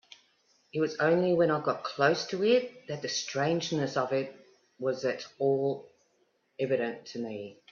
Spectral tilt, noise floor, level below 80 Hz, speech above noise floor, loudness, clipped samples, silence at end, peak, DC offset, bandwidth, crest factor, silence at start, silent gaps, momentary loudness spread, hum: -5 dB/octave; -72 dBFS; -74 dBFS; 43 dB; -30 LUFS; under 0.1%; 0.2 s; -10 dBFS; under 0.1%; 7.4 kHz; 20 dB; 0.75 s; none; 12 LU; none